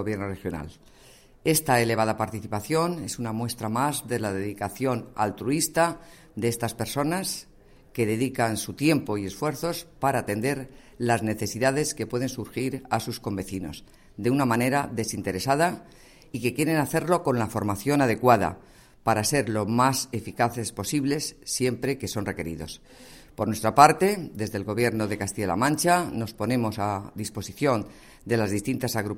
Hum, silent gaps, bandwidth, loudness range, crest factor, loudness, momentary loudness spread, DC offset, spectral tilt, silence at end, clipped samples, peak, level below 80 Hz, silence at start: none; none; 16.5 kHz; 4 LU; 26 dB; -26 LUFS; 11 LU; under 0.1%; -5 dB/octave; 0 s; under 0.1%; 0 dBFS; -54 dBFS; 0 s